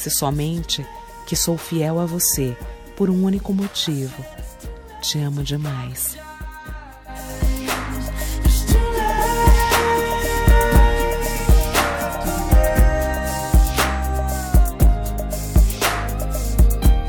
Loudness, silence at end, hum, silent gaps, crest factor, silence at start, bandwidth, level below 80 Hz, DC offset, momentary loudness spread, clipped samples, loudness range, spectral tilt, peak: -20 LUFS; 0 s; none; none; 16 dB; 0 s; over 20 kHz; -20 dBFS; under 0.1%; 18 LU; under 0.1%; 8 LU; -4.5 dB/octave; -2 dBFS